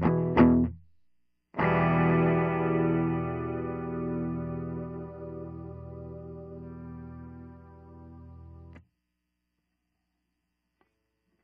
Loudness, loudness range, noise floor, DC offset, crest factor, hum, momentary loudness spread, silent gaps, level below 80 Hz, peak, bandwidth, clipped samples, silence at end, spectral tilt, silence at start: -27 LUFS; 21 LU; -81 dBFS; under 0.1%; 22 dB; 60 Hz at -75 dBFS; 25 LU; none; -50 dBFS; -8 dBFS; 5 kHz; under 0.1%; 2.65 s; -8 dB/octave; 0 s